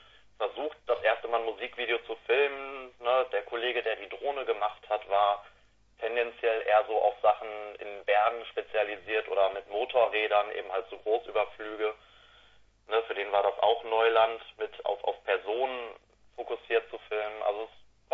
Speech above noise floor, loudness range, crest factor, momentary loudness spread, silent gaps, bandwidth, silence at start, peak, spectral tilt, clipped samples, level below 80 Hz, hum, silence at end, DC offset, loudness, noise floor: 31 dB; 3 LU; 20 dB; 11 LU; none; 5.6 kHz; 0.4 s; -10 dBFS; -4.5 dB/octave; under 0.1%; -68 dBFS; none; 0.35 s; under 0.1%; -30 LUFS; -60 dBFS